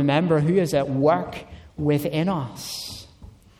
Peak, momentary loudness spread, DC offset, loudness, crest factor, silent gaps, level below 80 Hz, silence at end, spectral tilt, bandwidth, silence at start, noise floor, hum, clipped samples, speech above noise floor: -6 dBFS; 16 LU; under 0.1%; -23 LUFS; 16 dB; none; -50 dBFS; 0.3 s; -6.5 dB/octave; 16.5 kHz; 0 s; -47 dBFS; none; under 0.1%; 25 dB